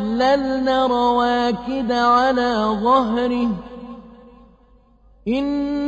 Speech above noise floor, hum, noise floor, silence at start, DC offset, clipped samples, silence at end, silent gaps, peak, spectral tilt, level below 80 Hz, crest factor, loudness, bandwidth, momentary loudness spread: 35 dB; none; -53 dBFS; 0 s; under 0.1%; under 0.1%; 0 s; none; -4 dBFS; -5.5 dB/octave; -46 dBFS; 14 dB; -18 LUFS; 8 kHz; 12 LU